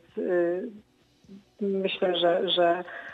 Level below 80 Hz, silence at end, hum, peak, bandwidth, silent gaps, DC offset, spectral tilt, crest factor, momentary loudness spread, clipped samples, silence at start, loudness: -74 dBFS; 0 s; none; -12 dBFS; 7.8 kHz; none; under 0.1%; -7 dB/octave; 16 dB; 10 LU; under 0.1%; 0.15 s; -26 LUFS